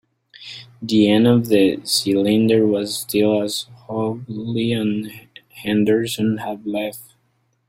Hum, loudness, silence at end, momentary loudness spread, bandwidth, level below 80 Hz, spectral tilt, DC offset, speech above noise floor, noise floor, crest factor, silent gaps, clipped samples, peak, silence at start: none; -19 LUFS; 0.65 s; 16 LU; 16 kHz; -58 dBFS; -5.5 dB/octave; under 0.1%; 47 dB; -65 dBFS; 18 dB; none; under 0.1%; -2 dBFS; 0.4 s